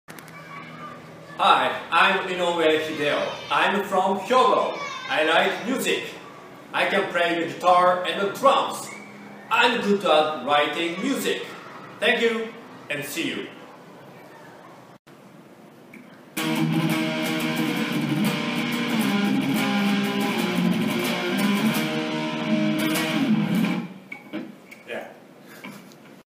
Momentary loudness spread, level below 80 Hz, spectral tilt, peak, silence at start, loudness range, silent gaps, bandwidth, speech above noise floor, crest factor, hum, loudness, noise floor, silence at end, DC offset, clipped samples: 20 LU; -70 dBFS; -4.5 dB/octave; -4 dBFS; 0.1 s; 7 LU; 14.99-15.05 s; 15.5 kHz; 26 dB; 20 dB; none; -22 LUFS; -47 dBFS; 0.05 s; under 0.1%; under 0.1%